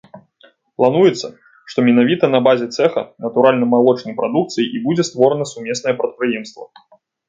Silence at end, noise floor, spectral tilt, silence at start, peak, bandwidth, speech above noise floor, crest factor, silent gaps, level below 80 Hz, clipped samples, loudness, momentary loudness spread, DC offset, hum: 0.65 s; -52 dBFS; -5.5 dB/octave; 0.15 s; 0 dBFS; 7.8 kHz; 37 dB; 16 dB; none; -64 dBFS; under 0.1%; -16 LUFS; 10 LU; under 0.1%; none